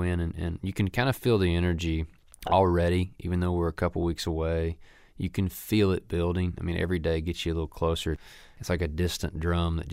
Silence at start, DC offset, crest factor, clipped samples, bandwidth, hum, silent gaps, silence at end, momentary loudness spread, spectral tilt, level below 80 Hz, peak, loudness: 0 s; under 0.1%; 18 dB; under 0.1%; 16 kHz; none; none; 0 s; 9 LU; -6.5 dB/octave; -40 dBFS; -10 dBFS; -28 LUFS